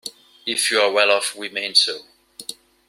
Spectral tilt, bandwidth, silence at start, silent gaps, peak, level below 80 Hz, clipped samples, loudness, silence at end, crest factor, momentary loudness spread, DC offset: 0.5 dB/octave; 16 kHz; 0.05 s; none; -2 dBFS; -72 dBFS; under 0.1%; -18 LUFS; 0.35 s; 20 dB; 19 LU; under 0.1%